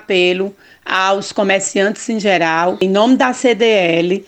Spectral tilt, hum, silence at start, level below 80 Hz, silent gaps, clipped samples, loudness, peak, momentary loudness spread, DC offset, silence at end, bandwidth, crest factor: -4 dB/octave; none; 0.1 s; -62 dBFS; none; under 0.1%; -14 LUFS; 0 dBFS; 6 LU; under 0.1%; 0.05 s; 9.2 kHz; 14 dB